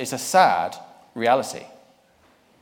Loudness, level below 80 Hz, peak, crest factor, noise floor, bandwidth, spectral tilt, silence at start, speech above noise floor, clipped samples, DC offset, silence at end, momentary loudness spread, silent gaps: -21 LUFS; -72 dBFS; -4 dBFS; 20 dB; -58 dBFS; 18.5 kHz; -3 dB/octave; 0 s; 38 dB; under 0.1%; under 0.1%; 0.95 s; 21 LU; none